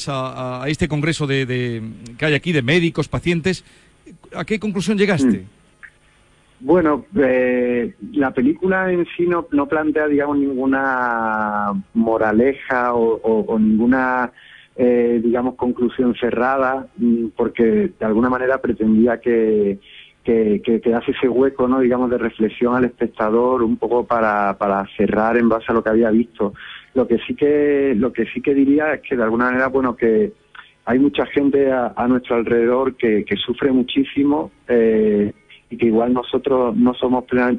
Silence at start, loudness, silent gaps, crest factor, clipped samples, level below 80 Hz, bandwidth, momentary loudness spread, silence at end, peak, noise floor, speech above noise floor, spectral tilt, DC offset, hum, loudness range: 0 s; -18 LUFS; none; 14 dB; under 0.1%; -48 dBFS; 11 kHz; 6 LU; 0 s; -4 dBFS; -54 dBFS; 37 dB; -7 dB/octave; under 0.1%; none; 2 LU